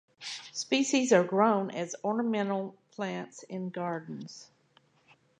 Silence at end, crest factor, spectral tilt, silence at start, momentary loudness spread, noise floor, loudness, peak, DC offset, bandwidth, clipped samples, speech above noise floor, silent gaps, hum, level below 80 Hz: 0.95 s; 20 dB; -4.5 dB/octave; 0.2 s; 17 LU; -66 dBFS; -30 LUFS; -10 dBFS; under 0.1%; 10.5 kHz; under 0.1%; 37 dB; none; none; -84 dBFS